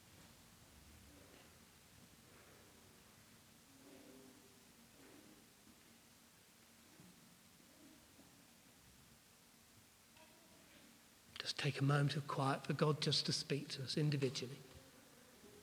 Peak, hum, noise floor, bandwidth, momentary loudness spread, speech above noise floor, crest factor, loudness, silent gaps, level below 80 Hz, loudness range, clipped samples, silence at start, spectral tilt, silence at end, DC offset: -22 dBFS; none; -67 dBFS; 16 kHz; 26 LU; 28 dB; 24 dB; -40 LUFS; none; -78 dBFS; 25 LU; under 0.1%; 0.1 s; -5 dB/octave; 0 s; under 0.1%